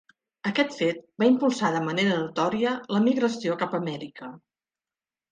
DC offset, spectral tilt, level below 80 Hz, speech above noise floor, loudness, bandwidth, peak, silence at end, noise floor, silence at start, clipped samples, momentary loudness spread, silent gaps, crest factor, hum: under 0.1%; -5.5 dB/octave; -72 dBFS; over 65 dB; -25 LUFS; 9.4 kHz; -8 dBFS; 0.95 s; under -90 dBFS; 0.45 s; under 0.1%; 11 LU; none; 18 dB; none